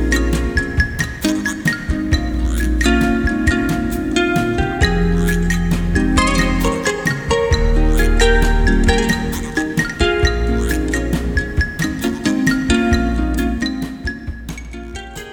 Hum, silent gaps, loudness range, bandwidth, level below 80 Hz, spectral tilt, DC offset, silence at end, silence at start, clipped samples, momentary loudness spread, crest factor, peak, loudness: none; none; 2 LU; 19 kHz; -20 dBFS; -5 dB/octave; under 0.1%; 0 s; 0 s; under 0.1%; 6 LU; 16 dB; 0 dBFS; -17 LUFS